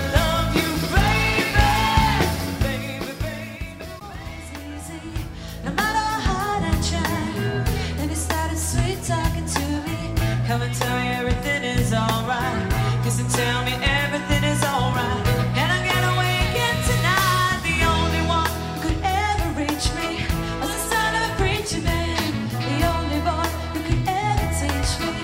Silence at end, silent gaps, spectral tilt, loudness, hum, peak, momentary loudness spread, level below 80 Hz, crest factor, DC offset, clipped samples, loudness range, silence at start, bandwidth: 0 s; none; -4.5 dB/octave; -22 LUFS; none; -2 dBFS; 10 LU; -30 dBFS; 20 dB; under 0.1%; under 0.1%; 5 LU; 0 s; 16.5 kHz